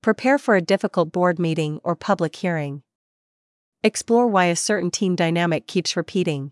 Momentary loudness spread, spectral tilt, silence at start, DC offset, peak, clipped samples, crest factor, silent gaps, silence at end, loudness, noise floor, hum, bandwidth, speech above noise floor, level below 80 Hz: 7 LU; -5 dB/octave; 0.05 s; under 0.1%; -4 dBFS; under 0.1%; 16 dB; 2.95-3.72 s; 0 s; -21 LUFS; under -90 dBFS; none; 12 kHz; over 69 dB; -70 dBFS